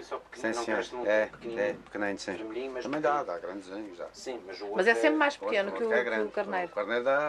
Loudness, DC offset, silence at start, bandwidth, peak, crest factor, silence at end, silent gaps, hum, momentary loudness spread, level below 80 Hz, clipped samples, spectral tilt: -30 LUFS; under 0.1%; 0 s; 12 kHz; -10 dBFS; 20 dB; 0 s; none; none; 14 LU; -68 dBFS; under 0.1%; -4 dB/octave